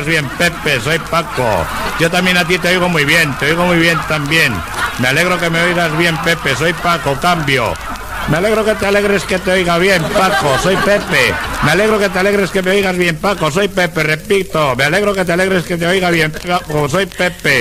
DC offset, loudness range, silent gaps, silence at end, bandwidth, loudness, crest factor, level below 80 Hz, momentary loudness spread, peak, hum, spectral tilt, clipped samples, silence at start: under 0.1%; 2 LU; none; 0 s; 16 kHz; -13 LUFS; 14 dB; -34 dBFS; 4 LU; 0 dBFS; none; -4.5 dB/octave; under 0.1%; 0 s